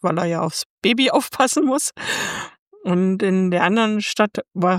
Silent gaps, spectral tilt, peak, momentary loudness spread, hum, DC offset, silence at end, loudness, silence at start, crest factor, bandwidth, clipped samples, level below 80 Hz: 0.66-0.78 s, 2.59-2.71 s; -4.5 dB/octave; -2 dBFS; 7 LU; none; under 0.1%; 0 s; -19 LUFS; 0.05 s; 18 dB; 16.5 kHz; under 0.1%; -64 dBFS